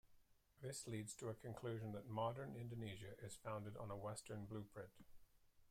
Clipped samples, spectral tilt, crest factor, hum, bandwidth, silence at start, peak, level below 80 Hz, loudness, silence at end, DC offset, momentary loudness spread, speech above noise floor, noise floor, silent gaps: under 0.1%; -5.5 dB/octave; 20 dB; none; 16 kHz; 0.05 s; -32 dBFS; -74 dBFS; -51 LUFS; 0.05 s; under 0.1%; 9 LU; 22 dB; -72 dBFS; none